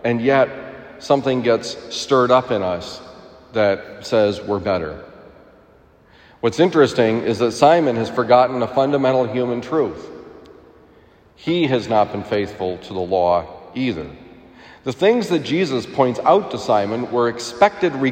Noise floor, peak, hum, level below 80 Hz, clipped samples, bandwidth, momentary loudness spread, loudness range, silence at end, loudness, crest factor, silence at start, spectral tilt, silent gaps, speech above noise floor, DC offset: -51 dBFS; 0 dBFS; none; -56 dBFS; under 0.1%; 15.5 kHz; 14 LU; 6 LU; 0 s; -18 LUFS; 18 dB; 0.05 s; -5.5 dB/octave; none; 33 dB; under 0.1%